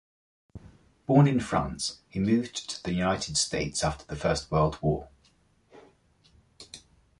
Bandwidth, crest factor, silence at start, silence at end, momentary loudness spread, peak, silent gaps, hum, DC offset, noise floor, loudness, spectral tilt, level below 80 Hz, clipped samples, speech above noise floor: 11.5 kHz; 20 dB; 0.55 s; 0.4 s; 15 LU; -10 dBFS; none; none; under 0.1%; -65 dBFS; -27 LUFS; -5 dB/octave; -48 dBFS; under 0.1%; 38 dB